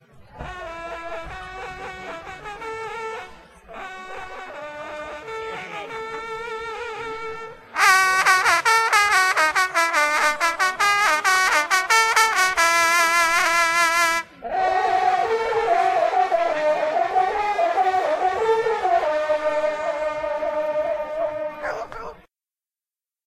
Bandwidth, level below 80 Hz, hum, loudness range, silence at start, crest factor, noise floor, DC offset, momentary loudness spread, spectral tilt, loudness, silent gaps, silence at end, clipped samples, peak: 15.5 kHz; -52 dBFS; none; 16 LU; 0.15 s; 20 dB; under -90 dBFS; under 0.1%; 18 LU; -0.5 dB/octave; -19 LUFS; none; 1.1 s; under 0.1%; -2 dBFS